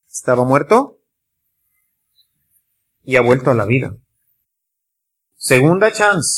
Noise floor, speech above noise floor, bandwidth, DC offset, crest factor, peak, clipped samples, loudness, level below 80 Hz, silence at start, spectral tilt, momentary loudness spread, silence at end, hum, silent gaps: -77 dBFS; 64 dB; 16 kHz; under 0.1%; 16 dB; 0 dBFS; under 0.1%; -14 LUFS; -54 dBFS; 0.15 s; -5 dB/octave; 8 LU; 0 s; none; none